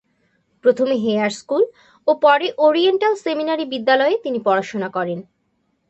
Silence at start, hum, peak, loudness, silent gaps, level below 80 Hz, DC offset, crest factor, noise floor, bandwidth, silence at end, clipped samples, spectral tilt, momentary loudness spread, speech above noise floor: 0.65 s; none; -2 dBFS; -18 LUFS; none; -68 dBFS; under 0.1%; 16 dB; -67 dBFS; 8.4 kHz; 0.65 s; under 0.1%; -5 dB/octave; 9 LU; 50 dB